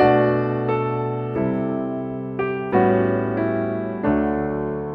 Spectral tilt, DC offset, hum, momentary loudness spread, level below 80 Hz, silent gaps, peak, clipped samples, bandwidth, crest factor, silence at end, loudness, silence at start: -10.5 dB/octave; under 0.1%; none; 8 LU; -46 dBFS; none; -4 dBFS; under 0.1%; 5.2 kHz; 18 dB; 0 s; -22 LUFS; 0 s